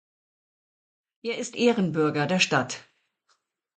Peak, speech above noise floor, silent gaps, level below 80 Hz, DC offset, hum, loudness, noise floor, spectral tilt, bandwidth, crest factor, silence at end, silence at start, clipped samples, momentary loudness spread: -8 dBFS; 47 dB; none; -70 dBFS; under 0.1%; none; -25 LUFS; -72 dBFS; -4.5 dB/octave; 9.4 kHz; 20 dB; 0.95 s; 1.25 s; under 0.1%; 12 LU